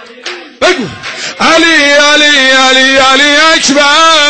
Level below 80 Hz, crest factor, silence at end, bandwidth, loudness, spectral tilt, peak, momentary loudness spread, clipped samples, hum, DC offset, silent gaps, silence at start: -44 dBFS; 6 dB; 0 s; 10.5 kHz; -5 LUFS; -1 dB/octave; 0 dBFS; 14 LU; 0.1%; none; 2%; none; 0 s